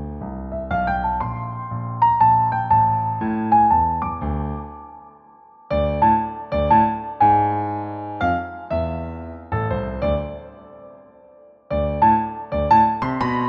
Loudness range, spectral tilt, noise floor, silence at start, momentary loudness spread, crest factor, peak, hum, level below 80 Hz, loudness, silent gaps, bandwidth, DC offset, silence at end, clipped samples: 7 LU; -9.5 dB/octave; -49 dBFS; 0 s; 14 LU; 16 dB; -4 dBFS; none; -36 dBFS; -20 LUFS; none; 5.8 kHz; under 0.1%; 0 s; under 0.1%